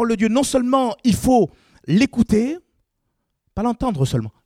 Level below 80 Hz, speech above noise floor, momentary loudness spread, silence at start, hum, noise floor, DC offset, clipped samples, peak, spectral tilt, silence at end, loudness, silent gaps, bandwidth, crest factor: -42 dBFS; 55 dB; 8 LU; 0 s; none; -73 dBFS; under 0.1%; under 0.1%; -4 dBFS; -6 dB/octave; 0.15 s; -19 LUFS; none; 16 kHz; 16 dB